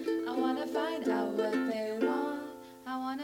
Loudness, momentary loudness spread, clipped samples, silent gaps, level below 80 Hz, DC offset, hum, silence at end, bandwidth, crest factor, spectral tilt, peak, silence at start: -33 LUFS; 9 LU; under 0.1%; none; -76 dBFS; under 0.1%; none; 0 s; 17 kHz; 16 dB; -5 dB/octave; -16 dBFS; 0 s